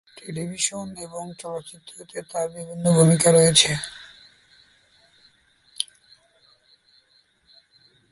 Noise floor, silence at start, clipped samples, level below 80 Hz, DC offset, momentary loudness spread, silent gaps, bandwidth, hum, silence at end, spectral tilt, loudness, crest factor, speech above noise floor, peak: -62 dBFS; 0.25 s; under 0.1%; -60 dBFS; under 0.1%; 21 LU; none; 11.5 kHz; none; 2.3 s; -4 dB/octave; -21 LUFS; 24 dB; 41 dB; -2 dBFS